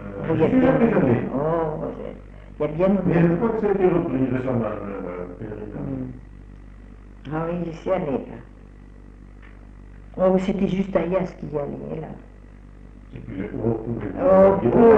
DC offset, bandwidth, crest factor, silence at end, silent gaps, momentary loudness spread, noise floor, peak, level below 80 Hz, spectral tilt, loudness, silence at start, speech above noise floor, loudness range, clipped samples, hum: under 0.1%; 7.8 kHz; 18 dB; 0 s; none; 18 LU; -43 dBFS; -4 dBFS; -42 dBFS; -9.5 dB/octave; -22 LUFS; 0 s; 22 dB; 9 LU; under 0.1%; none